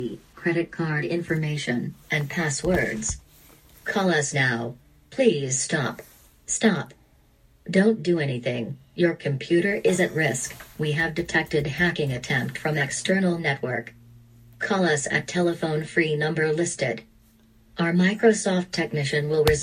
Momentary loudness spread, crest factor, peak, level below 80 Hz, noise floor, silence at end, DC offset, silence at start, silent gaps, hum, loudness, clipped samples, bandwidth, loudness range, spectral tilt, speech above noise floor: 10 LU; 20 dB; -4 dBFS; -50 dBFS; -58 dBFS; 0 s; under 0.1%; 0 s; none; none; -24 LUFS; under 0.1%; 15.5 kHz; 2 LU; -4.5 dB/octave; 34 dB